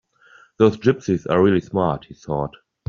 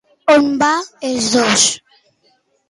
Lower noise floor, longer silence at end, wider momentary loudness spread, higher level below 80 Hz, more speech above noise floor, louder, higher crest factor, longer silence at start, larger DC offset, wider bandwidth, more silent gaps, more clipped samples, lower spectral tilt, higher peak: second, -52 dBFS vs -59 dBFS; second, 0.4 s vs 0.95 s; about the same, 11 LU vs 9 LU; first, -50 dBFS vs -56 dBFS; second, 33 dB vs 45 dB; second, -20 LUFS vs -14 LUFS; first, 20 dB vs 14 dB; first, 0.6 s vs 0.25 s; neither; second, 7.2 kHz vs 11.5 kHz; neither; neither; first, -6.5 dB/octave vs -2 dB/octave; about the same, -2 dBFS vs -2 dBFS